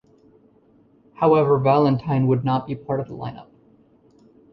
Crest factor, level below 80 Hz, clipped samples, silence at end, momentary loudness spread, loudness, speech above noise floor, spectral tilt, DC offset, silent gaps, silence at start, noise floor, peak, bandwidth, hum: 18 dB; -56 dBFS; under 0.1%; 1.1 s; 14 LU; -20 LUFS; 37 dB; -10.5 dB/octave; under 0.1%; none; 1.2 s; -56 dBFS; -4 dBFS; 5.6 kHz; none